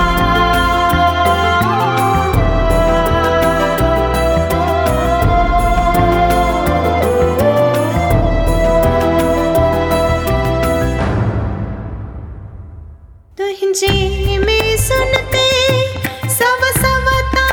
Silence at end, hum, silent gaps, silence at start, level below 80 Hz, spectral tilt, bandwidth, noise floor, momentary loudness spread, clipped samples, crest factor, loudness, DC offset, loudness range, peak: 0 s; none; none; 0 s; -22 dBFS; -5 dB/octave; 19.5 kHz; -38 dBFS; 6 LU; under 0.1%; 14 dB; -14 LUFS; under 0.1%; 5 LU; 0 dBFS